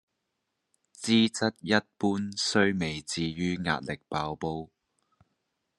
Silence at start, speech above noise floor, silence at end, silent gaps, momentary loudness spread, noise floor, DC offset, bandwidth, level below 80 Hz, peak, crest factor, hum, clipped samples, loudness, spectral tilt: 1 s; 53 dB; 1.1 s; none; 10 LU; -82 dBFS; under 0.1%; 11.5 kHz; -62 dBFS; -6 dBFS; 24 dB; none; under 0.1%; -28 LUFS; -4.5 dB/octave